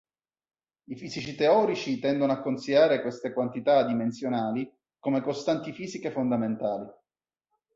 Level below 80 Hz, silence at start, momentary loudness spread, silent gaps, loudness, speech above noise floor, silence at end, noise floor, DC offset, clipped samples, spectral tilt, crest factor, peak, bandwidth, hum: -70 dBFS; 0.9 s; 14 LU; none; -27 LUFS; over 63 dB; 0.85 s; under -90 dBFS; under 0.1%; under 0.1%; -6 dB/octave; 18 dB; -10 dBFS; 7.8 kHz; none